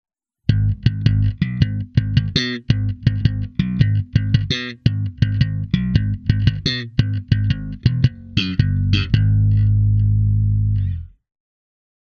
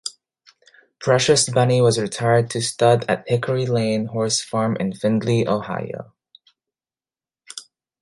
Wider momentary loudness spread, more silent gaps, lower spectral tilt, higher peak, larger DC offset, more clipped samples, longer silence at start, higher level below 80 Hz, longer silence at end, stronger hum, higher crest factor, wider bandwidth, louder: second, 5 LU vs 16 LU; neither; first, -7 dB/octave vs -4.5 dB/octave; first, 0 dBFS vs -4 dBFS; neither; neither; first, 0.5 s vs 0.05 s; first, -30 dBFS vs -58 dBFS; first, 1 s vs 0.4 s; neither; about the same, 18 dB vs 18 dB; second, 6.6 kHz vs 11.5 kHz; about the same, -19 LUFS vs -20 LUFS